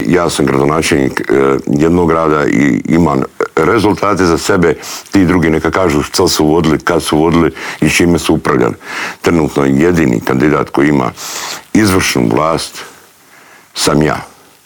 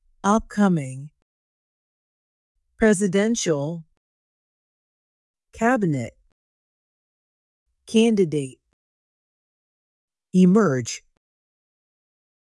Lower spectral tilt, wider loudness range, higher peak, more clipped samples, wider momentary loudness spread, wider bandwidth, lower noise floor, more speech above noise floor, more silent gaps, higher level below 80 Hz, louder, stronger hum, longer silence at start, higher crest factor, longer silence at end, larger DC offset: about the same, -5 dB/octave vs -6 dB/octave; second, 2 LU vs 6 LU; first, 0 dBFS vs -6 dBFS; neither; second, 6 LU vs 17 LU; first, over 20 kHz vs 12 kHz; second, -41 dBFS vs under -90 dBFS; second, 30 dB vs over 70 dB; second, none vs 1.22-2.55 s, 3.97-5.34 s, 6.32-7.66 s, 8.73-10.08 s; first, -38 dBFS vs -54 dBFS; first, -12 LUFS vs -21 LUFS; neither; second, 0 s vs 0.25 s; second, 10 dB vs 18 dB; second, 0.35 s vs 1.5 s; neither